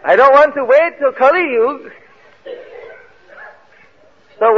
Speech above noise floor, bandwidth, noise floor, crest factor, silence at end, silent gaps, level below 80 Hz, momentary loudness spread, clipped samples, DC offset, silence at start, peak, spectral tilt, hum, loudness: 38 dB; 6.8 kHz; -50 dBFS; 14 dB; 0 s; none; -58 dBFS; 24 LU; under 0.1%; 0.3%; 0.05 s; 0 dBFS; -5 dB/octave; none; -12 LUFS